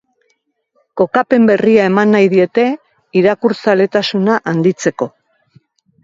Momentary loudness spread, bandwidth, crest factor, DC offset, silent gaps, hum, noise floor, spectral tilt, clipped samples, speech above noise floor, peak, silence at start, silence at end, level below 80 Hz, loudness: 8 LU; 7.8 kHz; 14 dB; under 0.1%; none; none; -64 dBFS; -6 dB/octave; under 0.1%; 52 dB; 0 dBFS; 0.95 s; 0.95 s; -60 dBFS; -13 LUFS